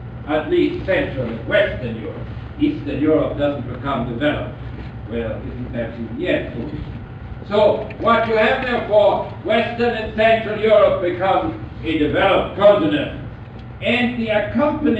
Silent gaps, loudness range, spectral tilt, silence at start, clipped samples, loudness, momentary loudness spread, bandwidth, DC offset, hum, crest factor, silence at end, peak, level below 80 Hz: none; 8 LU; -8 dB/octave; 0 s; under 0.1%; -19 LUFS; 15 LU; 8 kHz; 0.1%; none; 16 dB; 0 s; -2 dBFS; -38 dBFS